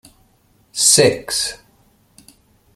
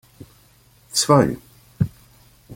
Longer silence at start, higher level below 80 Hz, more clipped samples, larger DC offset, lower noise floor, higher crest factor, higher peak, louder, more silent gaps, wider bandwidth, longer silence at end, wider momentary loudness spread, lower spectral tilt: second, 0.75 s vs 0.95 s; about the same, -54 dBFS vs -50 dBFS; neither; neither; about the same, -57 dBFS vs -54 dBFS; about the same, 20 dB vs 22 dB; about the same, 0 dBFS vs -2 dBFS; first, -14 LUFS vs -20 LUFS; neither; about the same, 16 kHz vs 16.5 kHz; first, 1.2 s vs 0 s; first, 14 LU vs 10 LU; second, -2 dB/octave vs -4.5 dB/octave